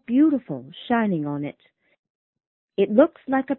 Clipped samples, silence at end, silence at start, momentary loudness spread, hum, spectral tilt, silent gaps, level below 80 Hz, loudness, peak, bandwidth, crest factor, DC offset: under 0.1%; 0.05 s; 0.1 s; 16 LU; none; -11.5 dB/octave; 1.99-2.04 s, 2.10-2.33 s, 2.47-2.68 s; -66 dBFS; -22 LUFS; -4 dBFS; 4.1 kHz; 20 dB; under 0.1%